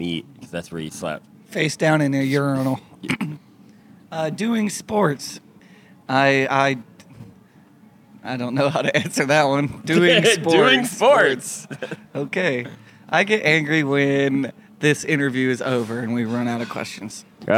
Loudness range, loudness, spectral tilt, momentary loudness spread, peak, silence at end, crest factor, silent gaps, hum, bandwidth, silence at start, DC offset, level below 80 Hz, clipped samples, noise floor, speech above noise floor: 6 LU; -20 LUFS; -4.5 dB/octave; 16 LU; -2 dBFS; 0 s; 20 dB; none; none; 16.5 kHz; 0 s; under 0.1%; -66 dBFS; under 0.1%; -50 dBFS; 30 dB